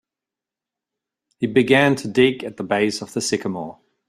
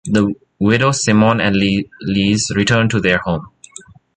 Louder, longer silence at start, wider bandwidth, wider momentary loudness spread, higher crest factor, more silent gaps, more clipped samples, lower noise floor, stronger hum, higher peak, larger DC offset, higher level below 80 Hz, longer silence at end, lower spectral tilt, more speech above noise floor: second, -19 LUFS vs -15 LUFS; first, 1.4 s vs 0.05 s; first, 14 kHz vs 9.4 kHz; first, 13 LU vs 8 LU; first, 20 dB vs 14 dB; neither; neither; first, -88 dBFS vs -41 dBFS; neither; about the same, -2 dBFS vs -2 dBFS; neither; second, -60 dBFS vs -42 dBFS; second, 0.35 s vs 0.7 s; about the same, -4.5 dB/octave vs -5 dB/octave; first, 68 dB vs 26 dB